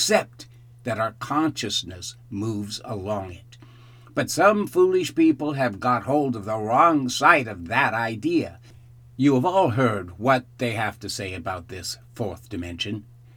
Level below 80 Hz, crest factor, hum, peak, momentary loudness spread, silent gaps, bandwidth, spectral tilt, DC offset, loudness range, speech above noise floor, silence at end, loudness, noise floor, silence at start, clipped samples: -56 dBFS; 24 dB; none; 0 dBFS; 14 LU; none; 19.5 kHz; -4.5 dB/octave; under 0.1%; 8 LU; 25 dB; 0.35 s; -23 LUFS; -48 dBFS; 0 s; under 0.1%